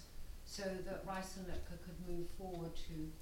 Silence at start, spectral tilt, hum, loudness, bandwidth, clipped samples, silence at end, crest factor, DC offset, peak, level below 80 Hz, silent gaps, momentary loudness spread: 0 s; -5 dB/octave; none; -48 LUFS; 16.5 kHz; under 0.1%; 0 s; 14 dB; under 0.1%; -30 dBFS; -50 dBFS; none; 7 LU